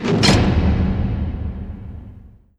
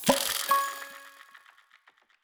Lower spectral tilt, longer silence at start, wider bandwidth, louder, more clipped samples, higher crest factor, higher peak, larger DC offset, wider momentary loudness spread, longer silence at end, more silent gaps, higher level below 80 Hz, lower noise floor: first, -5.5 dB/octave vs -2 dB/octave; about the same, 0 s vs 0 s; second, 12 kHz vs over 20 kHz; first, -18 LUFS vs -27 LUFS; neither; second, 18 dB vs 26 dB; first, 0 dBFS vs -6 dBFS; neither; about the same, 20 LU vs 22 LU; second, 0.3 s vs 0.85 s; neither; first, -26 dBFS vs -64 dBFS; second, -42 dBFS vs -63 dBFS